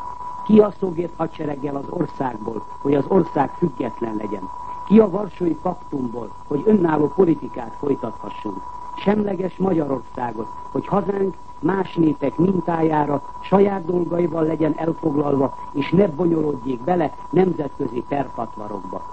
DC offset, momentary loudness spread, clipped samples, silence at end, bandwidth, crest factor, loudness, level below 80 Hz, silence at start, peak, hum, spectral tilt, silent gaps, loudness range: 1%; 13 LU; under 0.1%; 0 s; 8.4 kHz; 20 dB; -21 LUFS; -50 dBFS; 0 s; -2 dBFS; none; -9 dB/octave; none; 3 LU